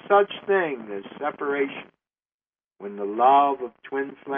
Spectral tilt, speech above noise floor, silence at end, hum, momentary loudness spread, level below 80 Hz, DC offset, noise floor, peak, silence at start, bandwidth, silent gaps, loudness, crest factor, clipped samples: -2.5 dB/octave; over 67 dB; 0 s; none; 17 LU; -76 dBFS; under 0.1%; under -90 dBFS; -6 dBFS; 0.05 s; 3.7 kHz; 2.34-2.39 s; -24 LUFS; 18 dB; under 0.1%